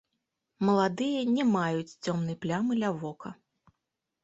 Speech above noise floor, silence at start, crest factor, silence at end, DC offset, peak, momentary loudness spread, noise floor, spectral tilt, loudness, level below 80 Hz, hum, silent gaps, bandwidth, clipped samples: 56 dB; 0.6 s; 18 dB; 0.9 s; under 0.1%; -12 dBFS; 11 LU; -85 dBFS; -6.5 dB/octave; -29 LUFS; -70 dBFS; none; none; 8 kHz; under 0.1%